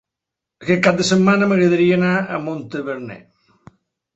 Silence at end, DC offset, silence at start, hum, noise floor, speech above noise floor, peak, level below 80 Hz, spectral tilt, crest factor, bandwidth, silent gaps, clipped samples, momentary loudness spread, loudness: 0.95 s; under 0.1%; 0.6 s; none; -84 dBFS; 67 dB; -2 dBFS; -56 dBFS; -6 dB/octave; 18 dB; 8.2 kHz; none; under 0.1%; 14 LU; -17 LUFS